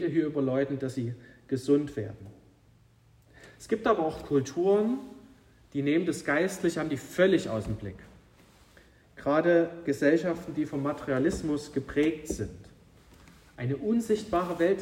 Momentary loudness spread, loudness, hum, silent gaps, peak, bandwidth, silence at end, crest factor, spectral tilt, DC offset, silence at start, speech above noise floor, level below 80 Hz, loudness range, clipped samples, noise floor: 12 LU; -29 LUFS; none; none; -10 dBFS; 16 kHz; 0 s; 18 dB; -6.5 dB/octave; under 0.1%; 0 s; 33 dB; -54 dBFS; 4 LU; under 0.1%; -61 dBFS